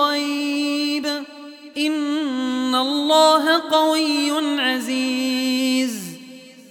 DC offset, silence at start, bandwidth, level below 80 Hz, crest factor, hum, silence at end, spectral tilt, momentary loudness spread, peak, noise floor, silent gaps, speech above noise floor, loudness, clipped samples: under 0.1%; 0 s; 17.5 kHz; -74 dBFS; 16 dB; none; 0.1 s; -2 dB/octave; 14 LU; -4 dBFS; -41 dBFS; none; 23 dB; -19 LUFS; under 0.1%